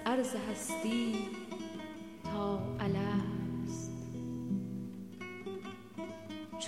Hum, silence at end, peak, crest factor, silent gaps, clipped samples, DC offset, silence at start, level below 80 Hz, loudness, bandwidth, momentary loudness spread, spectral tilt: none; 0 s; -20 dBFS; 16 dB; none; under 0.1%; under 0.1%; 0 s; -62 dBFS; -38 LUFS; 15.5 kHz; 11 LU; -5.5 dB/octave